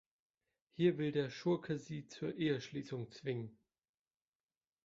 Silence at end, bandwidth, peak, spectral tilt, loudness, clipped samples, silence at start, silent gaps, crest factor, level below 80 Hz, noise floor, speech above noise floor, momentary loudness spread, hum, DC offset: 1.35 s; 7.6 kHz; -20 dBFS; -6 dB/octave; -39 LUFS; under 0.1%; 0.8 s; none; 20 dB; -78 dBFS; under -90 dBFS; over 52 dB; 11 LU; none; under 0.1%